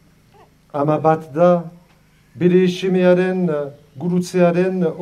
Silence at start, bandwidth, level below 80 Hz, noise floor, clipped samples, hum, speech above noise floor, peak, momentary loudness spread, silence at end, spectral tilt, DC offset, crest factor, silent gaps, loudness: 0.75 s; 12 kHz; -60 dBFS; -53 dBFS; under 0.1%; none; 37 dB; -2 dBFS; 11 LU; 0 s; -7.5 dB/octave; under 0.1%; 16 dB; none; -17 LUFS